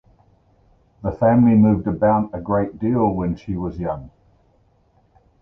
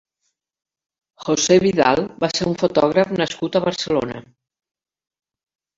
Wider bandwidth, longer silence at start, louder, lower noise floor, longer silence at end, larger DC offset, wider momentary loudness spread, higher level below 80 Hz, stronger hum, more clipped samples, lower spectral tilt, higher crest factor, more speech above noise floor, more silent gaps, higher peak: second, 3.1 kHz vs 7.8 kHz; second, 1.05 s vs 1.2 s; about the same, -19 LUFS vs -18 LUFS; second, -59 dBFS vs -74 dBFS; second, 1.35 s vs 1.55 s; neither; first, 14 LU vs 8 LU; first, -42 dBFS vs -54 dBFS; neither; neither; first, -11.5 dB/octave vs -4.5 dB/octave; about the same, 16 dB vs 20 dB; second, 41 dB vs 56 dB; neither; about the same, -4 dBFS vs -2 dBFS